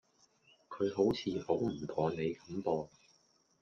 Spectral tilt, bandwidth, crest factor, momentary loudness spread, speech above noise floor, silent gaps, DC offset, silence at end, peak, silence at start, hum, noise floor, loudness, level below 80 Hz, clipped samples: -7 dB/octave; 7.2 kHz; 20 dB; 7 LU; 37 dB; none; under 0.1%; 0.75 s; -18 dBFS; 0.7 s; none; -71 dBFS; -36 LUFS; -68 dBFS; under 0.1%